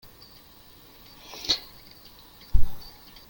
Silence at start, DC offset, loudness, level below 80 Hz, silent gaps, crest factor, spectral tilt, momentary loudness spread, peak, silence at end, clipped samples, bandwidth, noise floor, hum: 1.45 s; under 0.1%; -30 LUFS; -34 dBFS; none; 20 dB; -3 dB/octave; 22 LU; -4 dBFS; 0.5 s; under 0.1%; 17 kHz; -51 dBFS; none